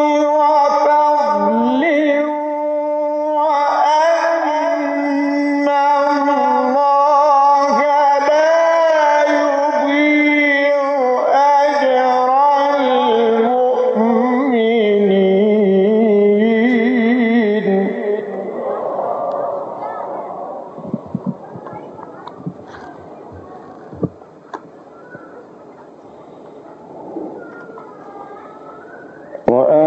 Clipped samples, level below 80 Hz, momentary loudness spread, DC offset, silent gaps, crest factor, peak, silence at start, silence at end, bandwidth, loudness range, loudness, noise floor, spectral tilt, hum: under 0.1%; -62 dBFS; 21 LU; under 0.1%; none; 16 dB; 0 dBFS; 0 s; 0 s; 8 kHz; 20 LU; -14 LUFS; -39 dBFS; -6 dB/octave; none